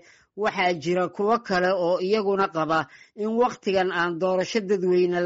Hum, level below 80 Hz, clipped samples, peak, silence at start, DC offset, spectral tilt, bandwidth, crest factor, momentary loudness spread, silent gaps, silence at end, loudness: none; -64 dBFS; under 0.1%; -10 dBFS; 0.35 s; under 0.1%; -4 dB/octave; 7.8 kHz; 14 dB; 4 LU; none; 0 s; -24 LUFS